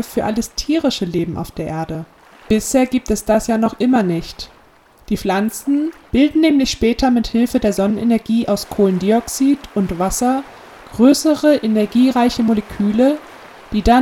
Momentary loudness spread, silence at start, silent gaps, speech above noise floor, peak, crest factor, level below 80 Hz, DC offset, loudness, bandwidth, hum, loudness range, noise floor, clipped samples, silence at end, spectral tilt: 10 LU; 0 s; none; 33 dB; 0 dBFS; 16 dB; -36 dBFS; under 0.1%; -17 LUFS; 17.5 kHz; none; 3 LU; -49 dBFS; under 0.1%; 0 s; -5 dB/octave